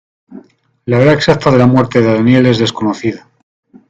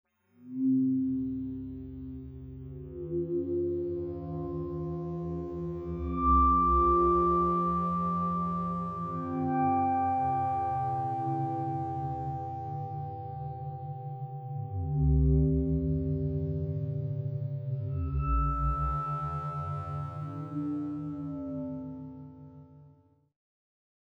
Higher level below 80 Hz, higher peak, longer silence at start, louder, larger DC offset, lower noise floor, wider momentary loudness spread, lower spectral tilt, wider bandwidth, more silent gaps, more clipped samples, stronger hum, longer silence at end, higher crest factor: about the same, -44 dBFS vs -40 dBFS; first, 0 dBFS vs -14 dBFS; about the same, 0.3 s vs 0.4 s; first, -11 LUFS vs -31 LUFS; neither; second, -40 dBFS vs -61 dBFS; second, 11 LU vs 14 LU; second, -7 dB/octave vs -11.5 dB/octave; first, 7.8 kHz vs 4.2 kHz; neither; first, 0.1% vs under 0.1%; neither; second, 0.75 s vs 1.2 s; second, 12 dB vs 18 dB